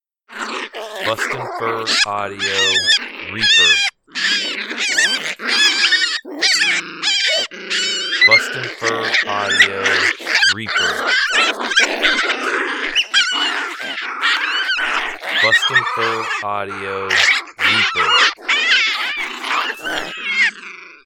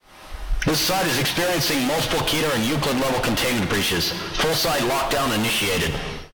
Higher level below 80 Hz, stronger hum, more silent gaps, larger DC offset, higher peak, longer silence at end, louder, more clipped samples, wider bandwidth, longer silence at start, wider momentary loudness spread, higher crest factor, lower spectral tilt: second, -56 dBFS vs -36 dBFS; neither; neither; second, under 0.1% vs 0.4%; first, 0 dBFS vs -12 dBFS; about the same, 0.1 s vs 0.05 s; first, -15 LUFS vs -21 LUFS; neither; about the same, 19 kHz vs 19.5 kHz; first, 0.3 s vs 0.05 s; first, 10 LU vs 4 LU; first, 18 dB vs 10 dB; second, -0.5 dB/octave vs -3.5 dB/octave